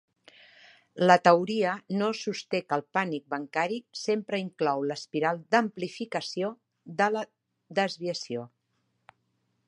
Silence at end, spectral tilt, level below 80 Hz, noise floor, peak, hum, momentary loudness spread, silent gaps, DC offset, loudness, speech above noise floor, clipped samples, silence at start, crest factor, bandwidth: 1.2 s; -5 dB/octave; -80 dBFS; -76 dBFS; -4 dBFS; none; 12 LU; none; under 0.1%; -28 LUFS; 48 dB; under 0.1%; 0.95 s; 26 dB; 11 kHz